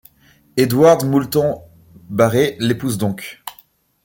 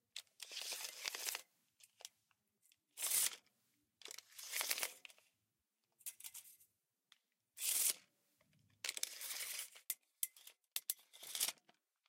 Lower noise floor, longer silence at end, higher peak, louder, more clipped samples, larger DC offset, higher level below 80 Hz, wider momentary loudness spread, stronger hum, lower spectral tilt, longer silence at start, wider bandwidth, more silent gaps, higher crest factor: second, -53 dBFS vs -89 dBFS; about the same, 0.55 s vs 0.55 s; first, -2 dBFS vs -18 dBFS; first, -17 LUFS vs -42 LUFS; neither; neither; first, -52 dBFS vs under -90 dBFS; second, 19 LU vs 22 LU; neither; first, -6 dB/octave vs 3.5 dB/octave; first, 0.55 s vs 0.15 s; about the same, 17 kHz vs 16.5 kHz; neither; second, 16 dB vs 30 dB